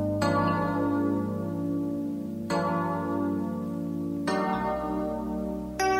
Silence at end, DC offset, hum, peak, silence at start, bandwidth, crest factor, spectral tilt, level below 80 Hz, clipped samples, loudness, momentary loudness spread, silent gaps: 0 s; under 0.1%; none; -14 dBFS; 0 s; 16 kHz; 16 dB; -6.5 dB/octave; -50 dBFS; under 0.1%; -29 LUFS; 6 LU; none